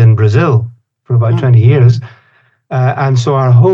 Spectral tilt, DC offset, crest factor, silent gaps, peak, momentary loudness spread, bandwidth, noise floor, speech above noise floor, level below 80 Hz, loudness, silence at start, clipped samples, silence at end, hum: -8.5 dB/octave; under 0.1%; 10 dB; none; 0 dBFS; 8 LU; 7.4 kHz; -50 dBFS; 42 dB; -46 dBFS; -10 LUFS; 0 s; under 0.1%; 0 s; none